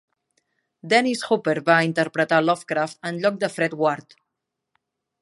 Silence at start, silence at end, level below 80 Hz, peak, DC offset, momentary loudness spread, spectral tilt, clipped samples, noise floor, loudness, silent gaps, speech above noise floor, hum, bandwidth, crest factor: 0.85 s; 1.2 s; -74 dBFS; -2 dBFS; under 0.1%; 6 LU; -5 dB/octave; under 0.1%; -82 dBFS; -21 LUFS; none; 60 dB; none; 11.5 kHz; 20 dB